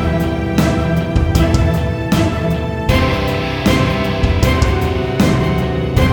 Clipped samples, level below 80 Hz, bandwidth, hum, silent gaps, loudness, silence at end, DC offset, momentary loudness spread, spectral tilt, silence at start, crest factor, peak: under 0.1%; -22 dBFS; over 20 kHz; none; none; -15 LUFS; 0 s; under 0.1%; 4 LU; -6.5 dB/octave; 0 s; 14 dB; 0 dBFS